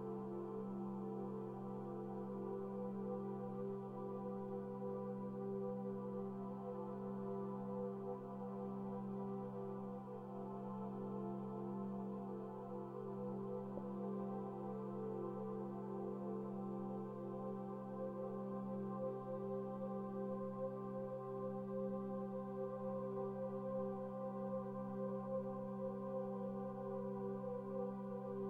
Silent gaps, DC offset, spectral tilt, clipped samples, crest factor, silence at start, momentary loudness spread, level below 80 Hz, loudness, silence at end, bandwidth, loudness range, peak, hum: none; under 0.1%; -10.5 dB/octave; under 0.1%; 14 dB; 0 s; 3 LU; -78 dBFS; -46 LUFS; 0 s; 3.7 kHz; 2 LU; -32 dBFS; none